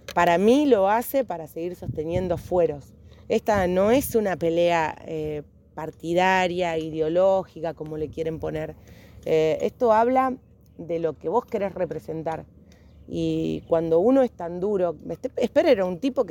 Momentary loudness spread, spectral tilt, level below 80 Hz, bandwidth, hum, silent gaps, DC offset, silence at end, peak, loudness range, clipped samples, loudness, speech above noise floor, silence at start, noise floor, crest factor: 13 LU; -6 dB/octave; -50 dBFS; 17 kHz; none; none; under 0.1%; 0 s; -6 dBFS; 3 LU; under 0.1%; -24 LUFS; 27 dB; 0.1 s; -50 dBFS; 18 dB